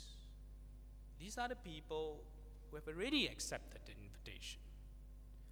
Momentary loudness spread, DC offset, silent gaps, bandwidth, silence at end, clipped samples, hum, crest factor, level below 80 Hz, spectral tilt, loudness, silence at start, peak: 21 LU; under 0.1%; none; over 20 kHz; 0 s; under 0.1%; 50 Hz at -55 dBFS; 22 dB; -56 dBFS; -3.5 dB/octave; -45 LUFS; 0 s; -26 dBFS